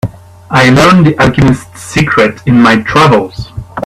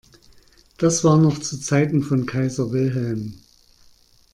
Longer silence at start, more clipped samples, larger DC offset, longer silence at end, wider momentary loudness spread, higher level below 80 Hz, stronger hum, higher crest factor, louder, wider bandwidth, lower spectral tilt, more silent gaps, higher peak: second, 0.05 s vs 0.8 s; first, 0.3% vs under 0.1%; neither; second, 0 s vs 0.95 s; first, 15 LU vs 11 LU; first, -32 dBFS vs -54 dBFS; neither; second, 8 dB vs 16 dB; first, -7 LUFS vs -20 LUFS; first, 14 kHz vs 12 kHz; about the same, -6 dB/octave vs -6 dB/octave; neither; first, 0 dBFS vs -6 dBFS